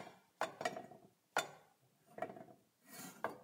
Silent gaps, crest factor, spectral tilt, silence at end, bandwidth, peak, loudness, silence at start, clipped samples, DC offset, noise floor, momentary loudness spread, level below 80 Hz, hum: none; 28 dB; -2.5 dB/octave; 0 s; 16.5 kHz; -20 dBFS; -46 LUFS; 0 s; under 0.1%; under 0.1%; -72 dBFS; 20 LU; under -90 dBFS; none